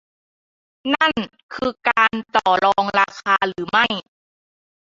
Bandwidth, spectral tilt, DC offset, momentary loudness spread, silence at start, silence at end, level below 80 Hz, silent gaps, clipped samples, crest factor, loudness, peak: 7.8 kHz; -4 dB/octave; under 0.1%; 10 LU; 0.85 s; 0.95 s; -58 dBFS; 1.43-1.49 s; under 0.1%; 18 dB; -19 LUFS; -2 dBFS